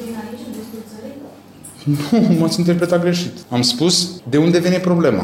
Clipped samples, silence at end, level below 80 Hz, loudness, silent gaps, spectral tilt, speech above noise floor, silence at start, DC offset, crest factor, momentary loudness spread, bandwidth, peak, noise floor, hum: under 0.1%; 0 s; -58 dBFS; -16 LUFS; none; -5 dB/octave; 24 dB; 0 s; under 0.1%; 14 dB; 19 LU; 16 kHz; -4 dBFS; -39 dBFS; none